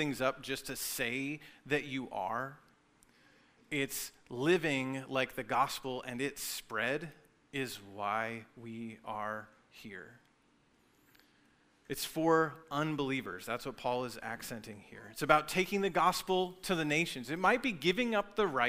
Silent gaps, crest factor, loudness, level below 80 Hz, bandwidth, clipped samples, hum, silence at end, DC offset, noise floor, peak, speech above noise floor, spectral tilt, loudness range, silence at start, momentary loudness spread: none; 26 dB; -35 LUFS; -64 dBFS; 16 kHz; under 0.1%; none; 0 s; under 0.1%; -70 dBFS; -10 dBFS; 35 dB; -4 dB/octave; 10 LU; 0 s; 15 LU